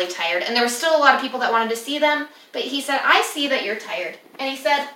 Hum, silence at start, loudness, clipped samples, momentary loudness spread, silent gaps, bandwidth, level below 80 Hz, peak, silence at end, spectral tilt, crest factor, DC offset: none; 0 s; -20 LUFS; under 0.1%; 12 LU; none; 16.5 kHz; -88 dBFS; -2 dBFS; 0 s; -1 dB/octave; 20 dB; under 0.1%